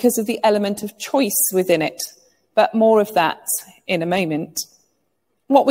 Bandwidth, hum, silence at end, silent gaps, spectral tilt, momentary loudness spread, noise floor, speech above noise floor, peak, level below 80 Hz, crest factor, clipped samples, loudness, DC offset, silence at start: 16.5 kHz; none; 0 s; none; -3.5 dB/octave; 12 LU; -71 dBFS; 53 dB; -2 dBFS; -66 dBFS; 18 dB; under 0.1%; -19 LUFS; under 0.1%; 0 s